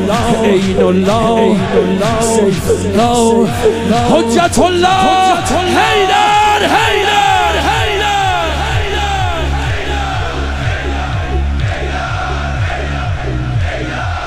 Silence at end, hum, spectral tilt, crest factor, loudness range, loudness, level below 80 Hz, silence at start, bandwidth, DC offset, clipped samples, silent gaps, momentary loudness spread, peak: 0 s; none; -5 dB/octave; 12 dB; 7 LU; -12 LUFS; -24 dBFS; 0 s; 15.5 kHz; under 0.1%; under 0.1%; none; 8 LU; 0 dBFS